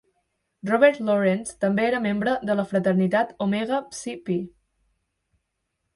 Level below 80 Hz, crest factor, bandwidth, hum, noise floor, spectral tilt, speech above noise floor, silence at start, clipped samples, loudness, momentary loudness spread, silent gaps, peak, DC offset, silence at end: -62 dBFS; 22 dB; 11.5 kHz; none; -78 dBFS; -6 dB/octave; 55 dB; 0.65 s; under 0.1%; -23 LUFS; 10 LU; none; -2 dBFS; under 0.1%; 1.45 s